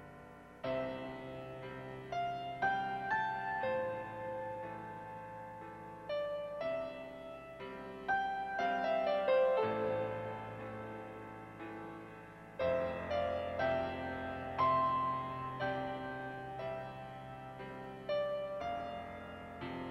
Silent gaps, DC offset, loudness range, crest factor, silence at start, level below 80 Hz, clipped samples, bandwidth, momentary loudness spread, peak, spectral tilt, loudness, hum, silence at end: none; under 0.1%; 7 LU; 18 dB; 0 s; -66 dBFS; under 0.1%; 13 kHz; 15 LU; -22 dBFS; -6.5 dB/octave; -39 LUFS; none; 0 s